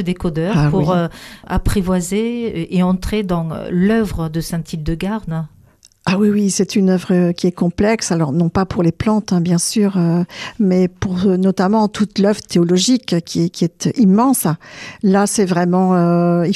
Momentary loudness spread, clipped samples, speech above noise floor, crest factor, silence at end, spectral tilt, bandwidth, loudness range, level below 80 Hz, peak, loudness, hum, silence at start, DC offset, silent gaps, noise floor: 8 LU; under 0.1%; 34 dB; 12 dB; 0 s; -6 dB/octave; 14 kHz; 4 LU; -34 dBFS; -4 dBFS; -16 LUFS; none; 0 s; under 0.1%; none; -49 dBFS